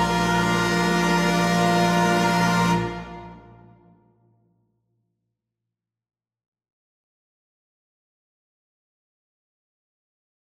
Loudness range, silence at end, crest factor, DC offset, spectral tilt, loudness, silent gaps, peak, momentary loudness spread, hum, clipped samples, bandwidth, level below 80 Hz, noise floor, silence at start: 11 LU; 7.05 s; 18 dB; under 0.1%; -5 dB/octave; -20 LUFS; none; -8 dBFS; 11 LU; none; under 0.1%; 15 kHz; -48 dBFS; -86 dBFS; 0 s